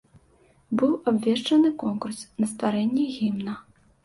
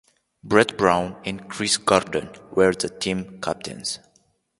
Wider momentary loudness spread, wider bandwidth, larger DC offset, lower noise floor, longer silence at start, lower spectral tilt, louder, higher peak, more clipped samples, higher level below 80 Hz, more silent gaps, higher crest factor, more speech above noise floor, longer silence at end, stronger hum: about the same, 11 LU vs 11 LU; about the same, 11.5 kHz vs 11.5 kHz; neither; second, -60 dBFS vs -64 dBFS; first, 0.7 s vs 0.45 s; first, -5.5 dB/octave vs -3.5 dB/octave; second, -25 LUFS vs -22 LUFS; second, -10 dBFS vs 0 dBFS; neither; second, -64 dBFS vs -52 dBFS; neither; second, 14 dB vs 24 dB; second, 36 dB vs 41 dB; second, 0.45 s vs 0.65 s; neither